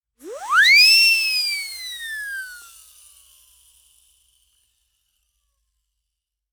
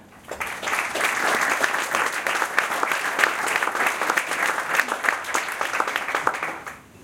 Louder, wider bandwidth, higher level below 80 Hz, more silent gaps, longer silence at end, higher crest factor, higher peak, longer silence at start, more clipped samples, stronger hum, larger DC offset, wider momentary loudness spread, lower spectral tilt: first, -14 LUFS vs -23 LUFS; first, over 20 kHz vs 17 kHz; about the same, -68 dBFS vs -64 dBFS; neither; first, 3.9 s vs 0 s; second, 18 dB vs 24 dB; second, -4 dBFS vs 0 dBFS; first, 0.25 s vs 0 s; neither; neither; neither; first, 24 LU vs 8 LU; second, 4 dB/octave vs -0.5 dB/octave